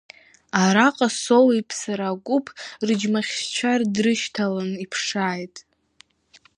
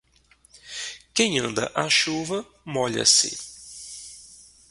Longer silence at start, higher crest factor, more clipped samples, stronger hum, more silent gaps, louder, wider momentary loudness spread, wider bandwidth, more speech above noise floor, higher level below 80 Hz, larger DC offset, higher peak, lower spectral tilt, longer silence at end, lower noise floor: about the same, 0.55 s vs 0.55 s; about the same, 22 dB vs 22 dB; neither; neither; neither; about the same, -22 LUFS vs -22 LUFS; second, 11 LU vs 22 LU; about the same, 11.5 kHz vs 11.5 kHz; about the same, 35 dB vs 36 dB; second, -70 dBFS vs -62 dBFS; neither; about the same, -2 dBFS vs -4 dBFS; first, -4 dB/octave vs -1.5 dB/octave; first, 0.95 s vs 0.35 s; about the same, -57 dBFS vs -59 dBFS